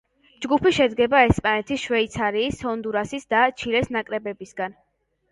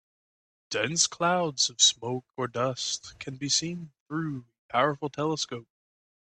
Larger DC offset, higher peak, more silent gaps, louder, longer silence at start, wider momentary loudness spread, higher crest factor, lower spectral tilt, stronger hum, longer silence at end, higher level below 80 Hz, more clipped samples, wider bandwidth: neither; first, -4 dBFS vs -8 dBFS; second, none vs 4.00-4.06 s, 4.58-4.69 s; first, -22 LUFS vs -27 LUFS; second, 0.4 s vs 0.7 s; about the same, 13 LU vs 15 LU; about the same, 20 dB vs 22 dB; first, -5 dB/octave vs -2.5 dB/octave; neither; about the same, 0.6 s vs 0.6 s; first, -44 dBFS vs -68 dBFS; neither; about the same, 11.5 kHz vs 11 kHz